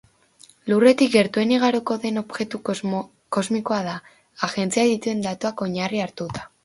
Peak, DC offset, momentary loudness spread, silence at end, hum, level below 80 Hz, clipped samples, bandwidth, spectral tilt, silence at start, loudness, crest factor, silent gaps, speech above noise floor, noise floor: -2 dBFS; under 0.1%; 12 LU; 0.2 s; none; -62 dBFS; under 0.1%; 11.5 kHz; -5 dB/octave; 0.65 s; -22 LUFS; 20 dB; none; 32 dB; -53 dBFS